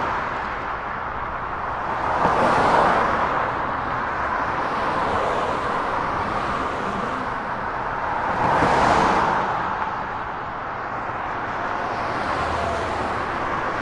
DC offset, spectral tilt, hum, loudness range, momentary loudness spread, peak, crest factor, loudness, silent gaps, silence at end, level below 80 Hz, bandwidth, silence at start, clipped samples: under 0.1%; -5.5 dB/octave; none; 5 LU; 10 LU; -2 dBFS; 20 dB; -23 LUFS; none; 0 s; -42 dBFS; 11.5 kHz; 0 s; under 0.1%